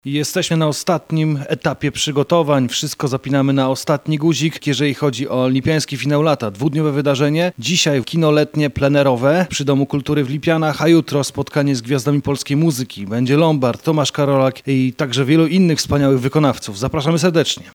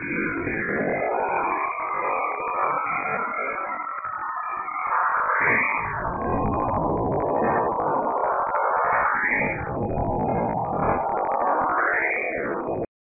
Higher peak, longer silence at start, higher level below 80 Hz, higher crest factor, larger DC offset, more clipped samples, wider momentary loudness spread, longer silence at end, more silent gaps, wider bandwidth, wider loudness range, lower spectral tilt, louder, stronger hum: first, -2 dBFS vs -8 dBFS; about the same, 0.05 s vs 0 s; about the same, -48 dBFS vs -44 dBFS; about the same, 14 dB vs 16 dB; neither; neither; about the same, 5 LU vs 7 LU; second, 0.05 s vs 0.3 s; neither; first, 18 kHz vs 2.7 kHz; about the same, 2 LU vs 3 LU; second, -5.5 dB/octave vs -12.5 dB/octave; first, -17 LUFS vs -24 LUFS; neither